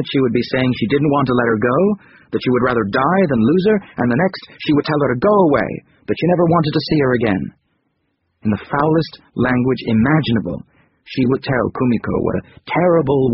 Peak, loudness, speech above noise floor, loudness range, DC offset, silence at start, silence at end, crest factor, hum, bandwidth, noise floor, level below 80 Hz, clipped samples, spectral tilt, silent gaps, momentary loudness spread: -2 dBFS; -17 LUFS; 52 dB; 3 LU; under 0.1%; 0 s; 0 s; 16 dB; none; 5.8 kHz; -68 dBFS; -44 dBFS; under 0.1%; -6 dB/octave; none; 10 LU